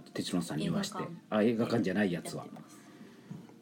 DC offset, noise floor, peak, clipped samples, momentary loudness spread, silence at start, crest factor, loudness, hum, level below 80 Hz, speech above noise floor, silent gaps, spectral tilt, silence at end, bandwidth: under 0.1%; -53 dBFS; -16 dBFS; under 0.1%; 23 LU; 0 s; 18 dB; -33 LUFS; none; -72 dBFS; 21 dB; none; -5.5 dB/octave; 0.05 s; 18 kHz